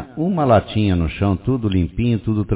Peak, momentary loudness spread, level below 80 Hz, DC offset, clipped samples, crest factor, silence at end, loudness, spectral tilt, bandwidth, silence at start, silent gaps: 0 dBFS; 4 LU; -30 dBFS; under 0.1%; under 0.1%; 16 dB; 0 s; -19 LUFS; -12 dB/octave; 4 kHz; 0 s; none